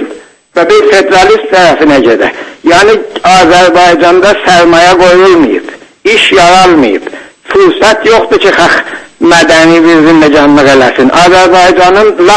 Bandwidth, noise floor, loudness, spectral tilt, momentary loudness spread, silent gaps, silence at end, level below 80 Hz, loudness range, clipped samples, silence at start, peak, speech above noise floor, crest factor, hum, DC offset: 11 kHz; -27 dBFS; -4 LUFS; -4 dB/octave; 8 LU; none; 0 s; -34 dBFS; 2 LU; 10%; 0 s; 0 dBFS; 24 dB; 4 dB; none; 0.3%